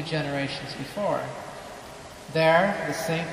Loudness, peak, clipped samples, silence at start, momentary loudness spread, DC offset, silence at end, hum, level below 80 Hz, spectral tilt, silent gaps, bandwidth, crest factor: -26 LUFS; -8 dBFS; under 0.1%; 0 s; 20 LU; under 0.1%; 0 s; none; -58 dBFS; -5 dB/octave; none; 15 kHz; 20 dB